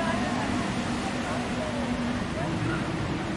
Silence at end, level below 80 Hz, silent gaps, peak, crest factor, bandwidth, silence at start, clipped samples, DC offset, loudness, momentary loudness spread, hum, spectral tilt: 0 s; -44 dBFS; none; -14 dBFS; 16 dB; 11.5 kHz; 0 s; under 0.1%; under 0.1%; -29 LUFS; 2 LU; none; -5.5 dB/octave